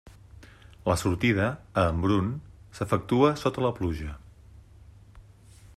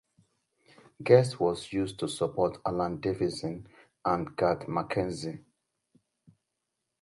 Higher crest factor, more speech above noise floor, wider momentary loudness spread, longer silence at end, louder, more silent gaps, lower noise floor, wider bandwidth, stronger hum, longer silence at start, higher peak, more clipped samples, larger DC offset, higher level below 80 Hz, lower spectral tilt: about the same, 20 dB vs 24 dB; second, 26 dB vs 55 dB; about the same, 15 LU vs 15 LU; second, 0.55 s vs 1.6 s; about the same, -27 LUFS vs -29 LUFS; neither; second, -52 dBFS vs -84 dBFS; first, 13.5 kHz vs 11.5 kHz; neither; second, 0.05 s vs 1 s; about the same, -8 dBFS vs -6 dBFS; neither; neither; first, -48 dBFS vs -60 dBFS; about the same, -6.5 dB/octave vs -6.5 dB/octave